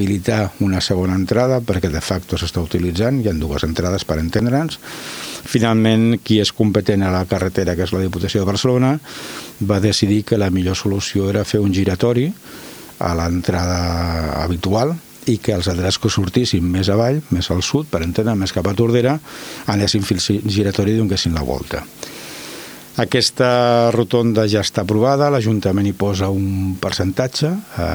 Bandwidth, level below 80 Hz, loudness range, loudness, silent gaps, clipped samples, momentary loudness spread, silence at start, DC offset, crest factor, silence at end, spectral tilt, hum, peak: over 20 kHz; -36 dBFS; 3 LU; -18 LUFS; none; under 0.1%; 9 LU; 0 s; under 0.1%; 16 dB; 0 s; -5.5 dB/octave; none; 0 dBFS